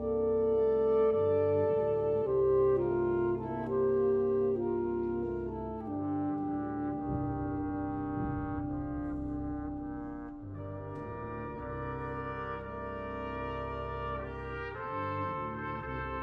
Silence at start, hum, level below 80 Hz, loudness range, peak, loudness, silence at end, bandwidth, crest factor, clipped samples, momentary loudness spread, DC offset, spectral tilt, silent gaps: 0 s; none; -50 dBFS; 10 LU; -20 dBFS; -33 LUFS; 0 s; 5 kHz; 14 dB; under 0.1%; 12 LU; under 0.1%; -10.5 dB/octave; none